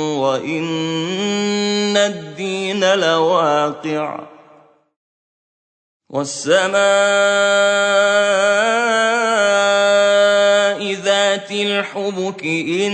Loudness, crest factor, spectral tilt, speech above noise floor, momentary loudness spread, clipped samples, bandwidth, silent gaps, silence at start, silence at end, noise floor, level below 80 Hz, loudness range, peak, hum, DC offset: -16 LUFS; 14 dB; -3 dB/octave; 33 dB; 9 LU; under 0.1%; 9.2 kHz; 4.96-6.00 s; 0 s; 0 s; -49 dBFS; -70 dBFS; 7 LU; -2 dBFS; none; under 0.1%